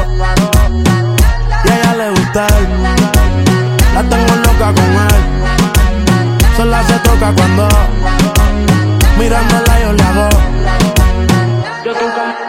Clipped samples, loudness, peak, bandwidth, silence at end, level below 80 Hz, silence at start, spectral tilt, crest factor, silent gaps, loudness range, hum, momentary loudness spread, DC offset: under 0.1%; -11 LUFS; 0 dBFS; 17 kHz; 0 s; -12 dBFS; 0 s; -5.5 dB/octave; 8 dB; none; 1 LU; none; 3 LU; under 0.1%